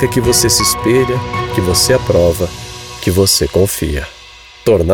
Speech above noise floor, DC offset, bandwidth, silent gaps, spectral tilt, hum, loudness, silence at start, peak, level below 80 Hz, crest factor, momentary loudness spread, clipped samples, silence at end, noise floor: 25 dB; under 0.1%; 19.5 kHz; none; -4 dB/octave; none; -13 LUFS; 0 s; -2 dBFS; -30 dBFS; 12 dB; 11 LU; under 0.1%; 0 s; -37 dBFS